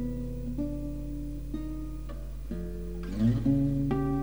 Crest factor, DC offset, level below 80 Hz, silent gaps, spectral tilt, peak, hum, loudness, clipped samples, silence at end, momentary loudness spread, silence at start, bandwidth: 16 dB; 0.7%; -38 dBFS; none; -9 dB/octave; -16 dBFS; none; -32 LUFS; under 0.1%; 0 s; 13 LU; 0 s; over 20 kHz